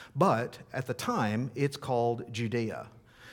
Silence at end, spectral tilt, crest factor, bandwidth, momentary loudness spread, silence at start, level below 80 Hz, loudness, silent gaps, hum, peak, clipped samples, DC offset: 0 s; -6.5 dB/octave; 22 dB; 18 kHz; 10 LU; 0 s; -68 dBFS; -31 LUFS; none; none; -10 dBFS; under 0.1%; under 0.1%